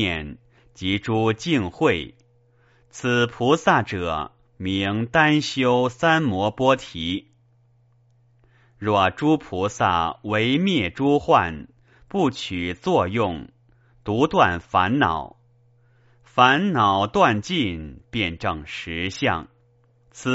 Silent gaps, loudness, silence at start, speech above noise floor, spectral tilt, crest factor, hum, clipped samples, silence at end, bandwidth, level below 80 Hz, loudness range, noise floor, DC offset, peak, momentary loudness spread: none; -22 LUFS; 0 s; 38 dB; -3.5 dB/octave; 22 dB; none; under 0.1%; 0 s; 8 kHz; -50 dBFS; 4 LU; -59 dBFS; under 0.1%; -2 dBFS; 12 LU